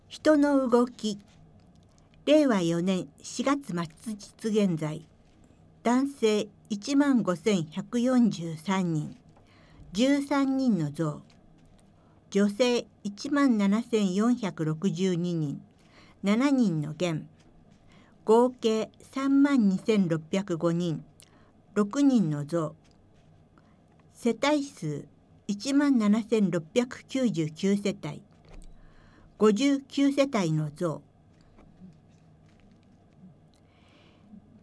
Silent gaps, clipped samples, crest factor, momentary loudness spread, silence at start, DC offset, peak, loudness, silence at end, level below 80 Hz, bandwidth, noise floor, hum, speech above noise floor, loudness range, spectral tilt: none; under 0.1%; 18 dB; 13 LU; 0.1 s; under 0.1%; -10 dBFS; -27 LUFS; 1.35 s; -62 dBFS; 11 kHz; -59 dBFS; none; 33 dB; 4 LU; -6 dB/octave